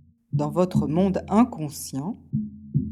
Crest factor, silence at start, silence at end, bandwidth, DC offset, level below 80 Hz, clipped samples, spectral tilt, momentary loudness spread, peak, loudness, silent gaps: 18 dB; 0.35 s; 0 s; 15 kHz; under 0.1%; -52 dBFS; under 0.1%; -7.5 dB/octave; 10 LU; -6 dBFS; -25 LUFS; none